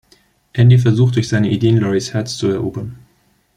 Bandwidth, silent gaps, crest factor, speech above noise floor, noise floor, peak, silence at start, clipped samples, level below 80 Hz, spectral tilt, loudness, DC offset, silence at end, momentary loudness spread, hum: 10 kHz; none; 14 dB; 44 dB; -58 dBFS; -2 dBFS; 0.55 s; under 0.1%; -48 dBFS; -7 dB/octave; -15 LUFS; under 0.1%; 0.65 s; 14 LU; none